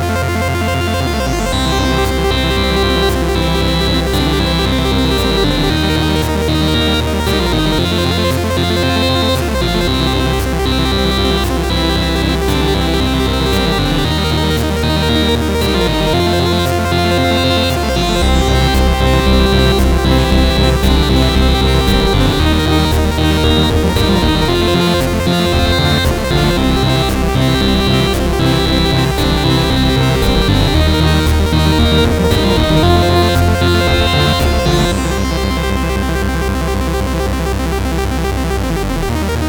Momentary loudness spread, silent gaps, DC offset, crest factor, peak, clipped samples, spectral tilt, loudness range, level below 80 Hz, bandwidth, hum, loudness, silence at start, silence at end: 4 LU; none; under 0.1%; 12 dB; 0 dBFS; under 0.1%; -5.5 dB/octave; 3 LU; -18 dBFS; over 20 kHz; none; -13 LUFS; 0 s; 0 s